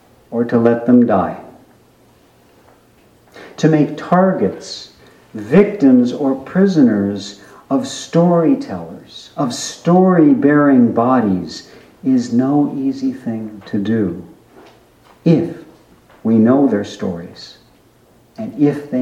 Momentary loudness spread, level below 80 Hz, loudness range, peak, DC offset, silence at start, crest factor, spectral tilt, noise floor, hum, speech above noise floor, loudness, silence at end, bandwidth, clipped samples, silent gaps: 18 LU; -56 dBFS; 6 LU; 0 dBFS; under 0.1%; 0.3 s; 16 dB; -7 dB/octave; -50 dBFS; none; 36 dB; -15 LUFS; 0 s; 9.6 kHz; under 0.1%; none